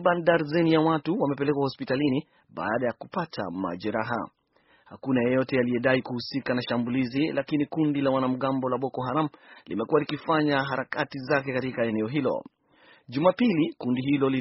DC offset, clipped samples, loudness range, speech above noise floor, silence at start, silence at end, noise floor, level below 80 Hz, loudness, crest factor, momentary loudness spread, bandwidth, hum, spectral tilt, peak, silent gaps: under 0.1%; under 0.1%; 3 LU; 38 dB; 0 s; 0 s; -63 dBFS; -64 dBFS; -26 LUFS; 20 dB; 9 LU; 6 kHz; none; -5 dB/octave; -8 dBFS; none